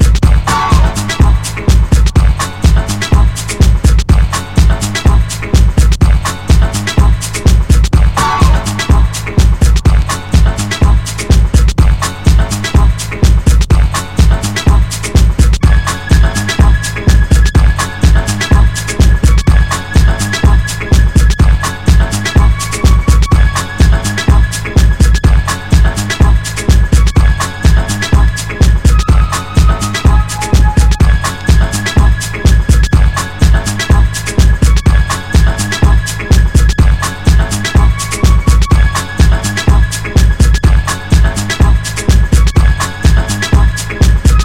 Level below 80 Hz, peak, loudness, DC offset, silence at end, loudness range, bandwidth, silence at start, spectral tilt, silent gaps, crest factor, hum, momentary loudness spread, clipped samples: -10 dBFS; 0 dBFS; -11 LUFS; under 0.1%; 0 s; 1 LU; 15 kHz; 0 s; -5 dB/octave; none; 8 dB; none; 3 LU; 0.7%